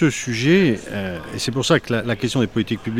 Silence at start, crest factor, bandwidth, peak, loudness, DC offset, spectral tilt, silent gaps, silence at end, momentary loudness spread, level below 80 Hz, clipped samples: 0 s; 16 dB; 15.5 kHz; -4 dBFS; -20 LUFS; under 0.1%; -5 dB/octave; none; 0 s; 10 LU; -48 dBFS; under 0.1%